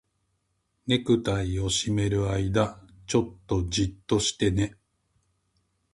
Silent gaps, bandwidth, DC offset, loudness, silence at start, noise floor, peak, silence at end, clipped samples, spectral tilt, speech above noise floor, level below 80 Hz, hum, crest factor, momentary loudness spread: none; 11.5 kHz; under 0.1%; -26 LUFS; 0.85 s; -75 dBFS; -8 dBFS; 1.2 s; under 0.1%; -5 dB/octave; 49 dB; -44 dBFS; none; 20 dB; 6 LU